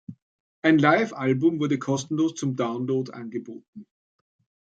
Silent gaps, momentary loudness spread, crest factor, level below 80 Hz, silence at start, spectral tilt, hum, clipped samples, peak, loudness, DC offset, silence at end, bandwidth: 0.22-0.62 s, 3.68-3.73 s; 16 LU; 22 dB; -72 dBFS; 0.1 s; -6 dB/octave; none; under 0.1%; -4 dBFS; -24 LUFS; under 0.1%; 0.85 s; 9 kHz